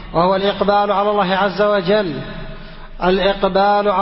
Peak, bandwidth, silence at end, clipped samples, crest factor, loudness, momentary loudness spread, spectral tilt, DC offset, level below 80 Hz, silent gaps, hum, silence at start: -2 dBFS; 5.8 kHz; 0 s; under 0.1%; 14 dB; -16 LUFS; 15 LU; -10.5 dB/octave; under 0.1%; -38 dBFS; none; none; 0 s